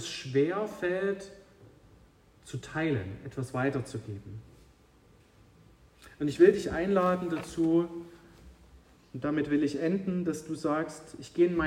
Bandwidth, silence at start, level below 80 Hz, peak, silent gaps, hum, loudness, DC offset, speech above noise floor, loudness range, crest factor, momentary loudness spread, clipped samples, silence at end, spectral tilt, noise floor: 12.5 kHz; 0 s; -58 dBFS; -8 dBFS; none; none; -30 LUFS; under 0.1%; 31 dB; 7 LU; 22 dB; 16 LU; under 0.1%; 0 s; -6.5 dB/octave; -60 dBFS